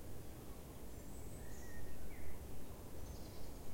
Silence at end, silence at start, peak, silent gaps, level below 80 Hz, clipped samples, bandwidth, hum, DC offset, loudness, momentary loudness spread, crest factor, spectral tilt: 0 s; 0 s; -32 dBFS; none; -56 dBFS; under 0.1%; 16.5 kHz; none; under 0.1%; -54 LUFS; 2 LU; 12 dB; -5 dB/octave